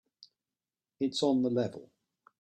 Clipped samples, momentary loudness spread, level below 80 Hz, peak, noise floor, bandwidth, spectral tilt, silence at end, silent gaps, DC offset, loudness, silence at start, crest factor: under 0.1%; 9 LU; -76 dBFS; -16 dBFS; under -90 dBFS; 9.6 kHz; -5.5 dB/octave; 0.6 s; none; under 0.1%; -31 LUFS; 1 s; 18 dB